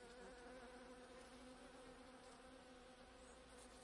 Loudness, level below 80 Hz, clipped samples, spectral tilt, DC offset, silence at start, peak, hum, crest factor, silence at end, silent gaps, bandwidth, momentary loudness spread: -61 LUFS; -72 dBFS; under 0.1%; -3.5 dB/octave; under 0.1%; 0 s; -46 dBFS; none; 14 dB; 0 s; none; 12 kHz; 4 LU